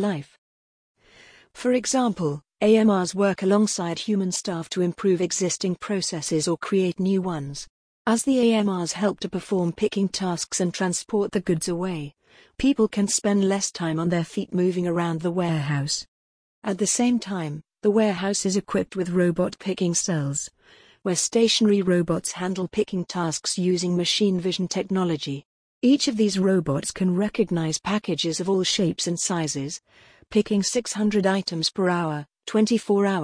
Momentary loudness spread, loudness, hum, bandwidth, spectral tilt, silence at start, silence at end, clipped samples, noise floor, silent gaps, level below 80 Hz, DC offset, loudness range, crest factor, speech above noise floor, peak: 8 LU; -24 LUFS; none; 10.5 kHz; -4.5 dB/octave; 0 s; 0 s; under 0.1%; -54 dBFS; 0.38-0.95 s, 7.70-8.05 s, 16.08-16.62 s, 25.45-25.81 s; -58 dBFS; under 0.1%; 2 LU; 16 dB; 31 dB; -6 dBFS